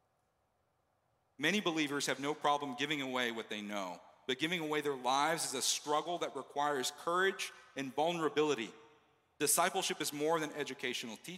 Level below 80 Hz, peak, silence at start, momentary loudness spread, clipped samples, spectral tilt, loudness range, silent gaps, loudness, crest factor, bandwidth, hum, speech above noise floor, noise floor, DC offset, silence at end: -88 dBFS; -16 dBFS; 1.4 s; 9 LU; under 0.1%; -2.5 dB/octave; 2 LU; none; -35 LUFS; 20 dB; 16 kHz; none; 43 dB; -79 dBFS; under 0.1%; 0 s